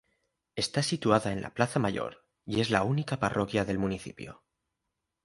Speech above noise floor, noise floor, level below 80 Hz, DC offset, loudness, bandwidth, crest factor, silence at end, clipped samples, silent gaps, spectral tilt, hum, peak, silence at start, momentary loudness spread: 55 dB; -84 dBFS; -56 dBFS; under 0.1%; -30 LUFS; 11.5 kHz; 24 dB; 0.9 s; under 0.1%; none; -5.5 dB/octave; none; -8 dBFS; 0.55 s; 15 LU